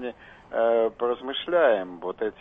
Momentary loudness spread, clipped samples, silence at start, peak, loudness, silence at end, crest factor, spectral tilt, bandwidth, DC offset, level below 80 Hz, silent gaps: 12 LU; under 0.1%; 0 s; -10 dBFS; -25 LUFS; 0.1 s; 16 dB; -6.5 dB/octave; 3.8 kHz; under 0.1%; -62 dBFS; none